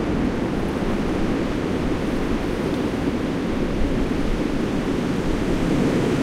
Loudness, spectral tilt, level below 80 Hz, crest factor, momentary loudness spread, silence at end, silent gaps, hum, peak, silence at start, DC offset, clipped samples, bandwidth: -23 LUFS; -6.5 dB/octave; -30 dBFS; 14 dB; 3 LU; 0 s; none; none; -8 dBFS; 0 s; under 0.1%; under 0.1%; 15.5 kHz